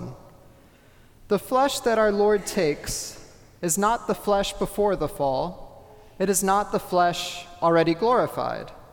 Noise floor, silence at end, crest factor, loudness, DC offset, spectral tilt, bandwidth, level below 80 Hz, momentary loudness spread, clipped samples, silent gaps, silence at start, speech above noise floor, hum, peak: -53 dBFS; 0.1 s; 16 dB; -24 LUFS; under 0.1%; -4 dB/octave; 19 kHz; -46 dBFS; 10 LU; under 0.1%; none; 0 s; 30 dB; none; -8 dBFS